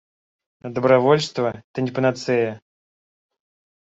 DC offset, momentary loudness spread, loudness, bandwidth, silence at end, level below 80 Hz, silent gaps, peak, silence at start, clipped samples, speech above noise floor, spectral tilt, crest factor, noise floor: under 0.1%; 14 LU; -21 LUFS; 8 kHz; 1.25 s; -64 dBFS; 1.64-1.74 s; -4 dBFS; 0.65 s; under 0.1%; over 70 dB; -6 dB/octave; 20 dB; under -90 dBFS